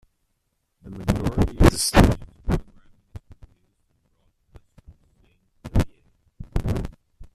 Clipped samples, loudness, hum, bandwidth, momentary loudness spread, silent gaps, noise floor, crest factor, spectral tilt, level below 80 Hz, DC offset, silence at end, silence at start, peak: under 0.1%; -23 LUFS; none; 14.5 kHz; 26 LU; none; -73 dBFS; 24 dB; -5.5 dB/octave; -30 dBFS; under 0.1%; 0.1 s; 0.85 s; 0 dBFS